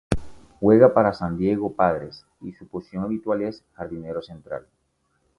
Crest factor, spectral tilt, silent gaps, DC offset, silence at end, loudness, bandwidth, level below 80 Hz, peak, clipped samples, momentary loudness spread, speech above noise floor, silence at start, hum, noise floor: 22 dB; -8.5 dB/octave; none; under 0.1%; 0.8 s; -22 LUFS; 11.5 kHz; -46 dBFS; -2 dBFS; under 0.1%; 21 LU; 48 dB; 0.1 s; none; -70 dBFS